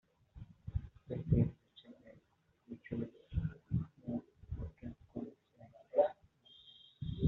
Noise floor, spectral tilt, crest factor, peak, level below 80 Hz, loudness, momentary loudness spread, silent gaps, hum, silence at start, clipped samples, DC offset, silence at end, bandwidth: -74 dBFS; -9 dB/octave; 22 dB; -18 dBFS; -52 dBFS; -40 LUFS; 25 LU; none; none; 0.35 s; under 0.1%; under 0.1%; 0 s; 4.1 kHz